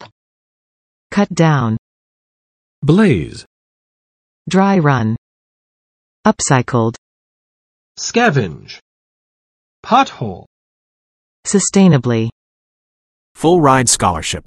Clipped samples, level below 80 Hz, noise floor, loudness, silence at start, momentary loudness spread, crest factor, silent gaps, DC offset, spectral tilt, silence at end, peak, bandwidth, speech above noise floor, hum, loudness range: under 0.1%; -46 dBFS; under -90 dBFS; -14 LUFS; 0 s; 15 LU; 16 dB; 0.12-1.10 s, 1.79-2.82 s, 3.46-4.45 s, 5.18-6.23 s, 6.98-7.95 s, 8.82-9.83 s, 10.47-11.43 s, 12.32-13.35 s; under 0.1%; -5 dB/octave; 0.05 s; 0 dBFS; 12.5 kHz; over 77 dB; none; 4 LU